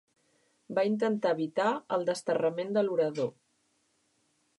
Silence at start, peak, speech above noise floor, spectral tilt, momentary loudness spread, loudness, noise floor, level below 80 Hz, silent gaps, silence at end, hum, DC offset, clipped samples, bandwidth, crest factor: 0.7 s; -16 dBFS; 44 dB; -6 dB/octave; 4 LU; -30 LUFS; -73 dBFS; -84 dBFS; none; 1.25 s; none; under 0.1%; under 0.1%; 11.5 kHz; 16 dB